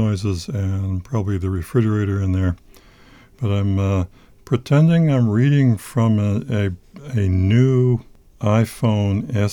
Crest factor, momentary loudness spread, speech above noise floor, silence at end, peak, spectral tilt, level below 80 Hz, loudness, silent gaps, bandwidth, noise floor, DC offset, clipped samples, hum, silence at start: 14 dB; 9 LU; 30 dB; 0 s; -4 dBFS; -8 dB/octave; -44 dBFS; -19 LUFS; none; 13.5 kHz; -47 dBFS; under 0.1%; under 0.1%; none; 0 s